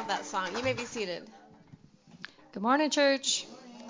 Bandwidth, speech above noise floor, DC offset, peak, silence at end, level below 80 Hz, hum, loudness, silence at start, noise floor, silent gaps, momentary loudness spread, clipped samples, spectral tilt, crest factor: 7.8 kHz; 27 dB; under 0.1%; -12 dBFS; 0 s; -66 dBFS; none; -29 LUFS; 0 s; -56 dBFS; none; 21 LU; under 0.1%; -2.5 dB/octave; 20 dB